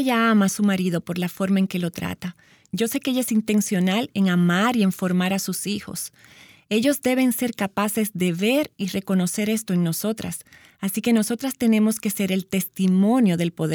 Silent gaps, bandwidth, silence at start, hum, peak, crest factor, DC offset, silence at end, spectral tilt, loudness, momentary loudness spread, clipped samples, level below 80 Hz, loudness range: none; over 20 kHz; 0 s; none; -8 dBFS; 14 dB; under 0.1%; 0 s; -5 dB/octave; -22 LUFS; 9 LU; under 0.1%; -62 dBFS; 2 LU